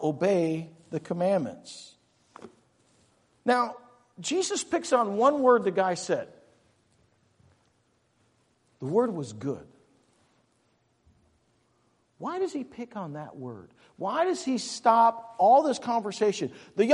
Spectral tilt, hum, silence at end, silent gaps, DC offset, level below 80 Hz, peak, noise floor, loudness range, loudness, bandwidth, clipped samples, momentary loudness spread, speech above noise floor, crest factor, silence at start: -4.5 dB/octave; none; 0 s; none; under 0.1%; -76 dBFS; -8 dBFS; -70 dBFS; 13 LU; -27 LUFS; 11.5 kHz; under 0.1%; 18 LU; 43 dB; 22 dB; 0 s